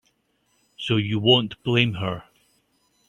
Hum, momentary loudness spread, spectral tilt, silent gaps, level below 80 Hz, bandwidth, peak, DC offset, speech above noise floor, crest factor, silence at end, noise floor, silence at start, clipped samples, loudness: none; 13 LU; -6.5 dB/octave; none; -58 dBFS; 9.6 kHz; -2 dBFS; under 0.1%; 47 dB; 22 dB; 0.85 s; -68 dBFS; 0.8 s; under 0.1%; -22 LUFS